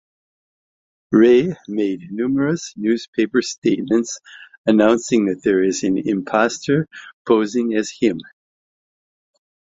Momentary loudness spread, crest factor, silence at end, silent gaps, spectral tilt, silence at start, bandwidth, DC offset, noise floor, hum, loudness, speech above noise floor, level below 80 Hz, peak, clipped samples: 9 LU; 18 dB; 1.4 s; 3.08-3.13 s, 3.58-3.62 s, 4.58-4.64 s, 7.13-7.25 s; -5.5 dB/octave; 1.1 s; 7.8 kHz; under 0.1%; under -90 dBFS; none; -19 LUFS; over 72 dB; -58 dBFS; 0 dBFS; under 0.1%